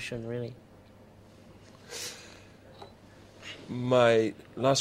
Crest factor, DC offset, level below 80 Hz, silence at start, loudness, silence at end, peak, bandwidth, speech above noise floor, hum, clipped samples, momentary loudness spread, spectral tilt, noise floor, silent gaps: 24 dB; under 0.1%; -64 dBFS; 0 s; -29 LUFS; 0 s; -8 dBFS; 16 kHz; 27 dB; none; under 0.1%; 27 LU; -4.5 dB/octave; -54 dBFS; none